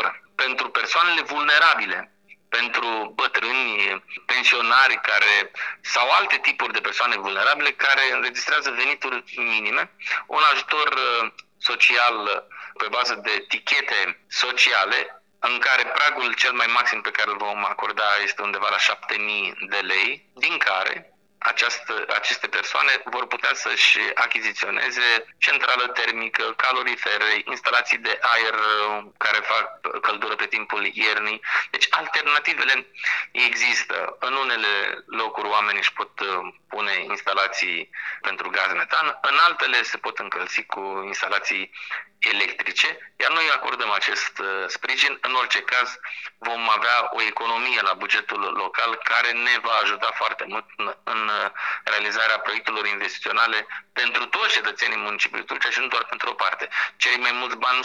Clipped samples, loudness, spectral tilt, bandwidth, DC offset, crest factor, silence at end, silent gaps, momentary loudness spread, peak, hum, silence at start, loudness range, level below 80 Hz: under 0.1%; -21 LUFS; 0.5 dB/octave; 12 kHz; under 0.1%; 22 dB; 0 s; none; 9 LU; -2 dBFS; none; 0 s; 3 LU; -84 dBFS